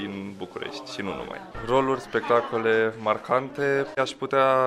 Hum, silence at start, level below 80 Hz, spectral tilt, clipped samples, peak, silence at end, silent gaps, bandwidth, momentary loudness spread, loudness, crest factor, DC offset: none; 0 s; -54 dBFS; -5.5 dB/octave; under 0.1%; -8 dBFS; 0 s; none; 13 kHz; 12 LU; -26 LUFS; 18 dB; under 0.1%